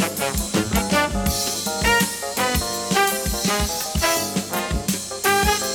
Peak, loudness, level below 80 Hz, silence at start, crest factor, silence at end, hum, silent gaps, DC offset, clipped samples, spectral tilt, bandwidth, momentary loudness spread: -4 dBFS; -21 LUFS; -32 dBFS; 0 s; 18 dB; 0 s; none; none; under 0.1%; under 0.1%; -3 dB/octave; over 20 kHz; 5 LU